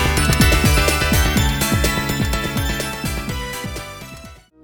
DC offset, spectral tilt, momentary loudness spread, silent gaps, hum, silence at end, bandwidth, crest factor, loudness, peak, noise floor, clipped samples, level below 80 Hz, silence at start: under 0.1%; -4 dB/octave; 16 LU; none; none; 0.3 s; over 20 kHz; 16 dB; -18 LUFS; -2 dBFS; -39 dBFS; under 0.1%; -24 dBFS; 0 s